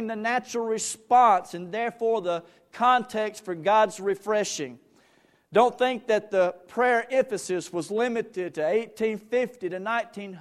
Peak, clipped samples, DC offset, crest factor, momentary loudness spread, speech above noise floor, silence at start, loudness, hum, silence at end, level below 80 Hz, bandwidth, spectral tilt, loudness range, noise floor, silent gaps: -6 dBFS; under 0.1%; under 0.1%; 20 dB; 9 LU; 37 dB; 0 s; -25 LUFS; none; 0 s; -72 dBFS; 13.5 kHz; -3.5 dB/octave; 2 LU; -62 dBFS; none